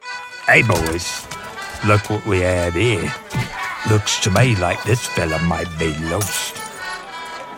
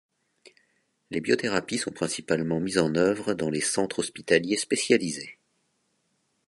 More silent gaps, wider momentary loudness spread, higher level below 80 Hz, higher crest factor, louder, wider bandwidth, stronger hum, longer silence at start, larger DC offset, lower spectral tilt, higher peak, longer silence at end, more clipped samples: neither; first, 14 LU vs 9 LU; first, -40 dBFS vs -62 dBFS; second, 18 dB vs 24 dB; first, -18 LUFS vs -26 LUFS; first, 17 kHz vs 11.5 kHz; neither; second, 0.05 s vs 1.1 s; neither; about the same, -4.5 dB/octave vs -4 dB/octave; first, 0 dBFS vs -4 dBFS; second, 0 s vs 1.15 s; neither